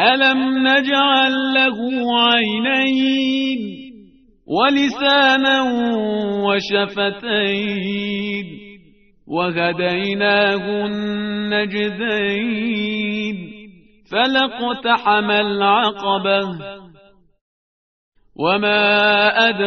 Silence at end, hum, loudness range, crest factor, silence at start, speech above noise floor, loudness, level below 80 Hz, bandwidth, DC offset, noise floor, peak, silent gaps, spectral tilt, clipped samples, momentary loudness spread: 0 s; none; 5 LU; 18 dB; 0 s; 34 dB; -17 LUFS; -58 dBFS; 6.6 kHz; under 0.1%; -51 dBFS; 0 dBFS; 17.41-18.12 s; -1.5 dB/octave; under 0.1%; 10 LU